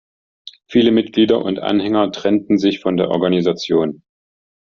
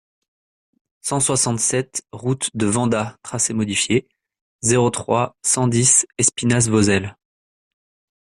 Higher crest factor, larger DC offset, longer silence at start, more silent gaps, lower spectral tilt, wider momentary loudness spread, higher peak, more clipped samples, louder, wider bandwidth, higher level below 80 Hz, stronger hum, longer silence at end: about the same, 16 dB vs 18 dB; neither; second, 0.45 s vs 1.05 s; second, none vs 4.41-4.59 s; about the same, -5 dB/octave vs -4 dB/octave; second, 4 LU vs 10 LU; about the same, -2 dBFS vs -2 dBFS; neither; about the same, -17 LUFS vs -18 LUFS; second, 7.2 kHz vs 14 kHz; about the same, -56 dBFS vs -54 dBFS; neither; second, 0.7 s vs 1.15 s